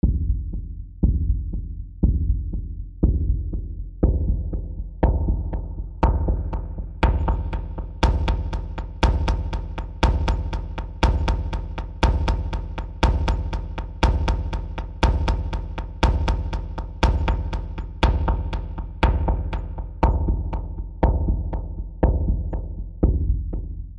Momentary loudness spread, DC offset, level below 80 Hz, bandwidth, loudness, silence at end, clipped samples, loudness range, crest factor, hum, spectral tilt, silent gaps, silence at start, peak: 11 LU; under 0.1%; -24 dBFS; 7.6 kHz; -25 LUFS; 0 s; under 0.1%; 1 LU; 18 dB; none; -7 dB/octave; none; 0.05 s; -4 dBFS